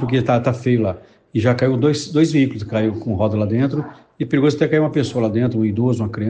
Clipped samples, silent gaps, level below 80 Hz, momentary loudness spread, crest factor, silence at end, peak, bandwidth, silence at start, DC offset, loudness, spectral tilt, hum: under 0.1%; none; -54 dBFS; 6 LU; 14 dB; 0 s; -2 dBFS; 9.2 kHz; 0 s; under 0.1%; -18 LUFS; -7.5 dB/octave; none